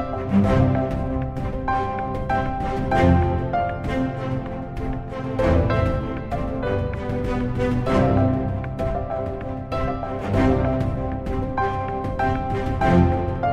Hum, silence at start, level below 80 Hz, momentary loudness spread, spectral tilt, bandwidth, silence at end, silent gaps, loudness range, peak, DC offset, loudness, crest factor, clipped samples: none; 0 s; -32 dBFS; 9 LU; -8.5 dB/octave; 9.6 kHz; 0 s; none; 2 LU; -4 dBFS; under 0.1%; -23 LUFS; 18 dB; under 0.1%